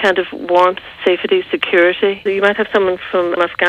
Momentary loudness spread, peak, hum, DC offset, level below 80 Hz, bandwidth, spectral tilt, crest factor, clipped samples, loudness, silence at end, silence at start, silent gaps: 5 LU; -2 dBFS; none; under 0.1%; -54 dBFS; 8.8 kHz; -5 dB/octave; 14 dB; under 0.1%; -15 LUFS; 0 s; 0 s; none